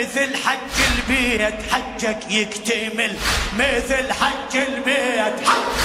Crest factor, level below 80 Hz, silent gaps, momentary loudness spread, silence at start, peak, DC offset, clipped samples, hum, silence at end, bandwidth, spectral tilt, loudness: 18 dB; -36 dBFS; none; 4 LU; 0 s; -2 dBFS; under 0.1%; under 0.1%; none; 0 s; 16 kHz; -2.5 dB/octave; -19 LUFS